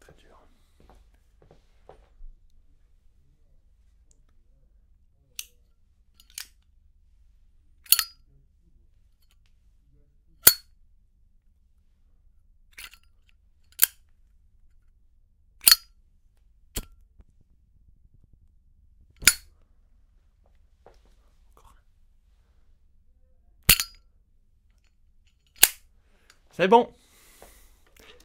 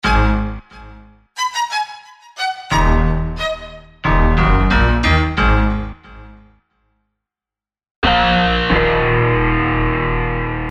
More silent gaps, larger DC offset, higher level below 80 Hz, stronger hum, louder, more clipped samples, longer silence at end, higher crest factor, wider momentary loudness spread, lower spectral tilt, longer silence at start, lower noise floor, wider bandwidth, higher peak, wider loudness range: second, none vs 7.91-8.02 s; neither; second, -52 dBFS vs -22 dBFS; neither; second, -21 LUFS vs -16 LUFS; neither; first, 1.4 s vs 0 s; first, 32 dB vs 14 dB; first, 27 LU vs 13 LU; second, -1 dB/octave vs -6 dB/octave; first, 2.2 s vs 0.05 s; second, -62 dBFS vs -90 dBFS; first, 16 kHz vs 10.5 kHz; about the same, 0 dBFS vs -2 dBFS; first, 21 LU vs 5 LU